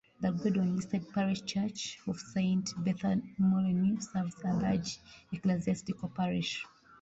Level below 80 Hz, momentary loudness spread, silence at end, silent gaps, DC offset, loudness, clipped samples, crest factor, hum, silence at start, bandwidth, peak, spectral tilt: -62 dBFS; 9 LU; 0.35 s; none; under 0.1%; -33 LUFS; under 0.1%; 14 dB; none; 0.2 s; 8 kHz; -18 dBFS; -6 dB/octave